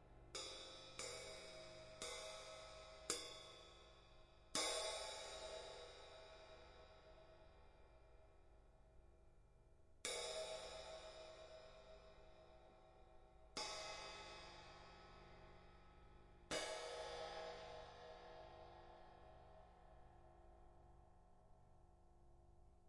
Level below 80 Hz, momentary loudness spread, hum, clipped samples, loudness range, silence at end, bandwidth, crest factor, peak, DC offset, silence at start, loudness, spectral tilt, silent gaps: -70 dBFS; 21 LU; none; under 0.1%; 17 LU; 0 s; 11.5 kHz; 28 dB; -28 dBFS; under 0.1%; 0 s; -51 LUFS; -1.5 dB/octave; none